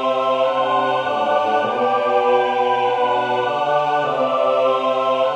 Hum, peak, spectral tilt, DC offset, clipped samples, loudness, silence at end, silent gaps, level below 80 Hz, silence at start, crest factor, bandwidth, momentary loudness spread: none; -4 dBFS; -5 dB/octave; under 0.1%; under 0.1%; -18 LUFS; 0 s; none; -66 dBFS; 0 s; 14 dB; 9 kHz; 2 LU